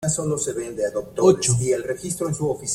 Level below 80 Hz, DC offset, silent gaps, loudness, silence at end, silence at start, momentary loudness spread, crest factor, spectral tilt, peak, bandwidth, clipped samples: -52 dBFS; under 0.1%; none; -22 LUFS; 0 s; 0 s; 9 LU; 18 dB; -5 dB/octave; -4 dBFS; 15.5 kHz; under 0.1%